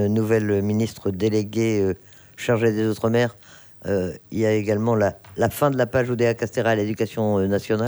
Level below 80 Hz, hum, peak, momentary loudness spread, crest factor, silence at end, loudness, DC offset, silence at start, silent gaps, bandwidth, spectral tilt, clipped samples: -56 dBFS; none; -6 dBFS; 5 LU; 16 dB; 0 s; -22 LUFS; under 0.1%; 0 s; none; over 20 kHz; -6.5 dB/octave; under 0.1%